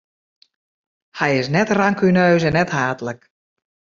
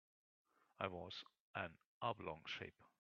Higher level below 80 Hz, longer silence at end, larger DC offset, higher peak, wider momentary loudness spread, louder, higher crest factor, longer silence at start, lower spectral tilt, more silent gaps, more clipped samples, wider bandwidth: first, -52 dBFS vs -82 dBFS; first, 0.8 s vs 0.15 s; neither; first, -2 dBFS vs -24 dBFS; first, 15 LU vs 7 LU; first, -17 LUFS vs -49 LUFS; second, 18 dB vs 28 dB; first, 1.15 s vs 0.8 s; first, -6.5 dB/octave vs -2.5 dB/octave; second, none vs 1.40-1.54 s, 1.86-2.01 s; neither; about the same, 7.4 kHz vs 7.2 kHz